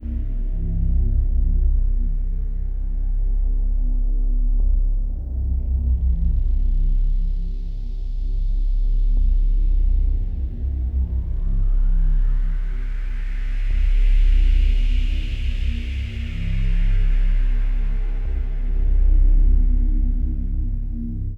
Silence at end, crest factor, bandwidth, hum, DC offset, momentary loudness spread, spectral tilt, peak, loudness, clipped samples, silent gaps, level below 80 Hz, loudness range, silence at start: 0 s; 10 dB; 3.6 kHz; none; under 0.1%; 8 LU; -8 dB/octave; -8 dBFS; -25 LUFS; under 0.1%; none; -18 dBFS; 2 LU; 0 s